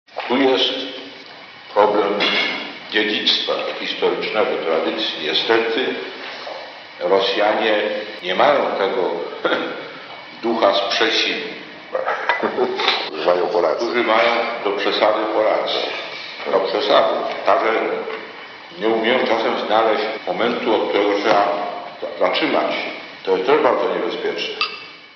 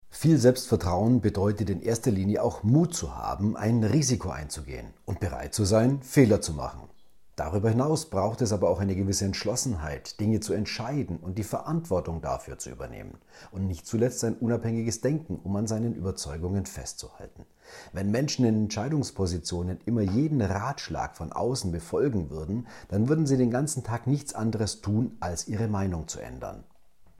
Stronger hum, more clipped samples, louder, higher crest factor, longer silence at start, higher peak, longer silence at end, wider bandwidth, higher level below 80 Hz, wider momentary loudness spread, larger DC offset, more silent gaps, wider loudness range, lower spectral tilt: neither; neither; first, -19 LUFS vs -28 LUFS; about the same, 18 dB vs 20 dB; about the same, 0.1 s vs 0.05 s; first, 0 dBFS vs -8 dBFS; about the same, 0.05 s vs 0.15 s; second, 6.8 kHz vs 16 kHz; second, -76 dBFS vs -48 dBFS; about the same, 13 LU vs 13 LU; neither; neither; second, 2 LU vs 5 LU; second, 0 dB/octave vs -6 dB/octave